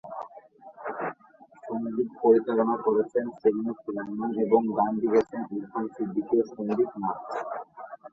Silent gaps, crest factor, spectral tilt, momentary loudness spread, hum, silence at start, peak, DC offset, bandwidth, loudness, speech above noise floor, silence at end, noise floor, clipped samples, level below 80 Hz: none; 20 dB; -8.5 dB/octave; 15 LU; none; 0.05 s; -8 dBFS; under 0.1%; 7 kHz; -27 LUFS; 29 dB; 0.05 s; -55 dBFS; under 0.1%; -70 dBFS